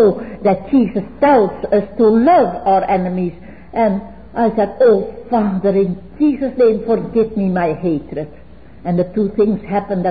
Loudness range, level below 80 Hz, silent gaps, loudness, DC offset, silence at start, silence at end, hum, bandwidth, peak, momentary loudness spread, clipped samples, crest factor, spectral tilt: 4 LU; -44 dBFS; none; -16 LUFS; 0.9%; 0 s; 0 s; none; 5 kHz; -4 dBFS; 9 LU; under 0.1%; 12 dB; -13 dB/octave